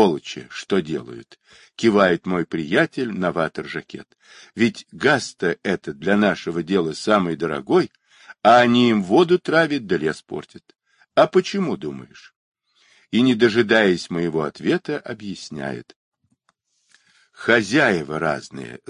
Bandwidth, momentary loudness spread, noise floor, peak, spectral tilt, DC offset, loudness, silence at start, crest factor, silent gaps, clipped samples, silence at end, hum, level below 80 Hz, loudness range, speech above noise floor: 10.5 kHz; 16 LU; -68 dBFS; -2 dBFS; -5.5 dB/octave; under 0.1%; -20 LUFS; 0 s; 20 dB; 12.36-12.52 s, 15.96-16.12 s; under 0.1%; 0.15 s; none; -58 dBFS; 6 LU; 48 dB